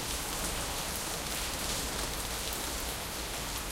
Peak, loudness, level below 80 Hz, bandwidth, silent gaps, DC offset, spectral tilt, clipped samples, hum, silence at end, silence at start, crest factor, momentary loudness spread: -14 dBFS; -34 LUFS; -44 dBFS; 17 kHz; none; under 0.1%; -2 dB/octave; under 0.1%; none; 0 s; 0 s; 22 dB; 3 LU